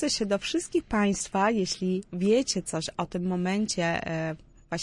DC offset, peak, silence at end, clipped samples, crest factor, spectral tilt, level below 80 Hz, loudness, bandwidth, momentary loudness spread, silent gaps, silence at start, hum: under 0.1%; -12 dBFS; 0 s; under 0.1%; 16 dB; -4.5 dB/octave; -54 dBFS; -28 LUFS; 11.5 kHz; 7 LU; none; 0 s; none